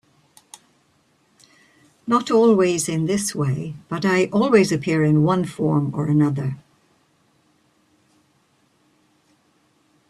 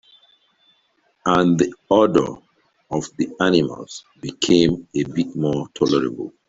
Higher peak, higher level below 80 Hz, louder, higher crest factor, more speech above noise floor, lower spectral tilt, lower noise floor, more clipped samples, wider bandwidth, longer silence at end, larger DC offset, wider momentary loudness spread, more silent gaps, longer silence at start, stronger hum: about the same, -4 dBFS vs -2 dBFS; second, -60 dBFS vs -52 dBFS; about the same, -19 LUFS vs -20 LUFS; about the same, 20 dB vs 18 dB; about the same, 44 dB vs 45 dB; about the same, -6 dB/octave vs -5.5 dB/octave; about the same, -62 dBFS vs -64 dBFS; neither; first, 13 kHz vs 8 kHz; first, 3.5 s vs 0.2 s; neither; about the same, 11 LU vs 13 LU; neither; first, 2.05 s vs 1.25 s; neither